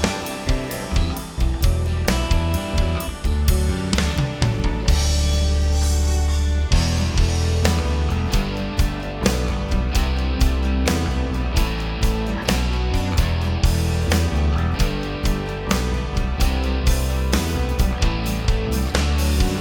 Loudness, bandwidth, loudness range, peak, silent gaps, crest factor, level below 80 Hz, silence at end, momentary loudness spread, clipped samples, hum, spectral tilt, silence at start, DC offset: -21 LUFS; 18.5 kHz; 2 LU; 0 dBFS; none; 18 dB; -22 dBFS; 0 s; 4 LU; under 0.1%; none; -5 dB/octave; 0 s; under 0.1%